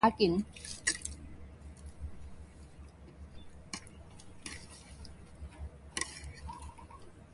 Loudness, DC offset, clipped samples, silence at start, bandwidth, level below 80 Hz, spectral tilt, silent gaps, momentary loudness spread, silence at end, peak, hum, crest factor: -38 LUFS; under 0.1%; under 0.1%; 0 s; 11.5 kHz; -52 dBFS; -4 dB/octave; none; 20 LU; 0 s; -12 dBFS; none; 26 dB